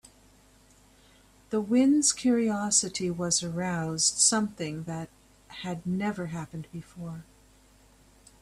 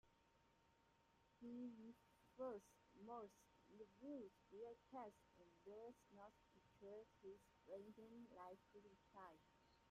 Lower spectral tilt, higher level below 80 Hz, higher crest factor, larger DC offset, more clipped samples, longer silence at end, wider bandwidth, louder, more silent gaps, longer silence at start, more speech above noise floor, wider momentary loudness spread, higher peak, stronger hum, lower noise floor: second, -3.5 dB/octave vs -6 dB/octave; first, -62 dBFS vs -88 dBFS; about the same, 20 dB vs 20 dB; neither; neither; first, 1.2 s vs 0 s; about the same, 14 kHz vs 13 kHz; first, -26 LUFS vs -61 LUFS; neither; first, 1.5 s vs 0.05 s; first, 31 dB vs 19 dB; first, 19 LU vs 11 LU; first, -10 dBFS vs -42 dBFS; neither; second, -59 dBFS vs -79 dBFS